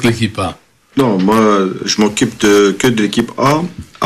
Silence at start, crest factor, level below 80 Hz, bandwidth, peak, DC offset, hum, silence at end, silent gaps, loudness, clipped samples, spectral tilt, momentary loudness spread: 0 s; 12 dB; -44 dBFS; 14 kHz; -2 dBFS; under 0.1%; none; 0 s; none; -13 LUFS; under 0.1%; -5 dB/octave; 9 LU